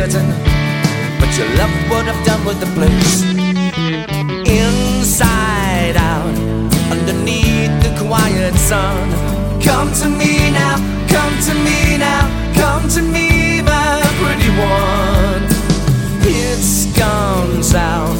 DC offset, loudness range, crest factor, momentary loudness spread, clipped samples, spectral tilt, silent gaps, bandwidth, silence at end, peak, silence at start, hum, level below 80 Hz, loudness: under 0.1%; 1 LU; 14 dB; 4 LU; under 0.1%; -4.5 dB/octave; none; 17 kHz; 0 s; 0 dBFS; 0 s; none; -20 dBFS; -14 LUFS